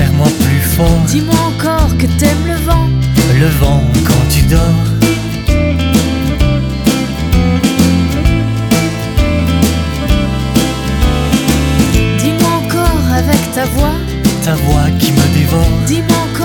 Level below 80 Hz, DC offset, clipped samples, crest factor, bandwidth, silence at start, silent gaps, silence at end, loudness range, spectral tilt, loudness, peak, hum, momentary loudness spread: -18 dBFS; under 0.1%; under 0.1%; 10 dB; 19.5 kHz; 0 s; none; 0 s; 2 LU; -5.5 dB/octave; -12 LUFS; 0 dBFS; none; 4 LU